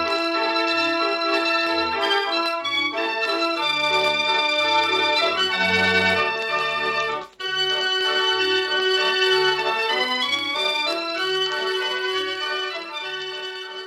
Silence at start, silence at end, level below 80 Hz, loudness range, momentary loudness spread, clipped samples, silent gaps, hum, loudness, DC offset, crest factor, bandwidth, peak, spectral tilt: 0 s; 0 s; -64 dBFS; 3 LU; 7 LU; under 0.1%; none; none; -20 LUFS; under 0.1%; 16 dB; 15.5 kHz; -6 dBFS; -2.5 dB/octave